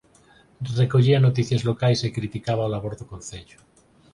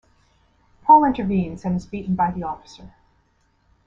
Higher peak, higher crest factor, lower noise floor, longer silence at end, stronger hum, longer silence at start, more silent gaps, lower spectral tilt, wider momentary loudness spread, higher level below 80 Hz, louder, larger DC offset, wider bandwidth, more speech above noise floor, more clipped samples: second, -6 dBFS vs -2 dBFS; about the same, 16 dB vs 20 dB; second, -55 dBFS vs -63 dBFS; second, 0.7 s vs 1 s; neither; second, 0.6 s vs 0.85 s; neither; second, -6.5 dB/octave vs -8.5 dB/octave; first, 19 LU vs 16 LU; about the same, -52 dBFS vs -48 dBFS; about the same, -22 LUFS vs -20 LUFS; neither; first, 11 kHz vs 7.4 kHz; second, 33 dB vs 39 dB; neither